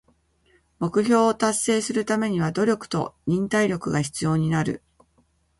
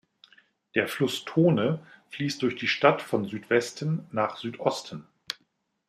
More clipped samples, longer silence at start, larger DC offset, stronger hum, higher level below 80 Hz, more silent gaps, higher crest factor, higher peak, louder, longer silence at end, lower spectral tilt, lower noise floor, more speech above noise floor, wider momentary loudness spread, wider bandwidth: neither; about the same, 0.8 s vs 0.75 s; neither; neither; first, -56 dBFS vs -72 dBFS; neither; second, 18 dB vs 24 dB; about the same, -6 dBFS vs -4 dBFS; first, -23 LUFS vs -27 LUFS; first, 0.8 s vs 0.55 s; about the same, -5.5 dB/octave vs -5.5 dB/octave; second, -65 dBFS vs -73 dBFS; second, 42 dB vs 46 dB; second, 7 LU vs 15 LU; second, 11.5 kHz vs 15 kHz